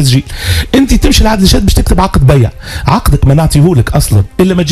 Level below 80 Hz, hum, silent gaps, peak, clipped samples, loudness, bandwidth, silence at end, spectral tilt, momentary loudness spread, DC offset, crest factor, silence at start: -14 dBFS; none; none; 0 dBFS; 2%; -9 LUFS; 15 kHz; 0 s; -5.5 dB/octave; 5 LU; under 0.1%; 8 dB; 0 s